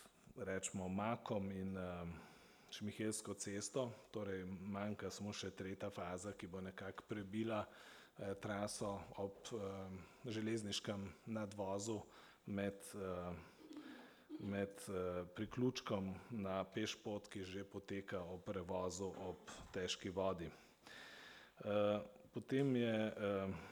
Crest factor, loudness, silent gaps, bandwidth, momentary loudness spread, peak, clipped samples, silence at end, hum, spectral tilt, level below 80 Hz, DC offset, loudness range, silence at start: 20 dB; -46 LUFS; none; over 20 kHz; 14 LU; -26 dBFS; under 0.1%; 0 s; none; -5 dB/octave; -74 dBFS; under 0.1%; 4 LU; 0 s